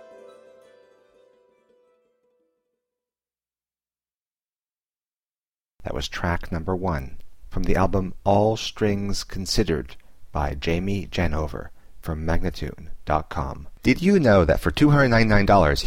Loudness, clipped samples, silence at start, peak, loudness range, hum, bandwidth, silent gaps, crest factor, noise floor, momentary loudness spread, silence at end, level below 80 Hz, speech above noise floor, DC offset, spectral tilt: -23 LUFS; under 0.1%; 0 s; -6 dBFS; 11 LU; none; 16 kHz; 4.53-4.57 s, 4.83-4.87 s, 5.38-5.53 s, 5.73-5.77 s; 18 dB; under -90 dBFS; 16 LU; 0 s; -34 dBFS; over 69 dB; under 0.1%; -6 dB/octave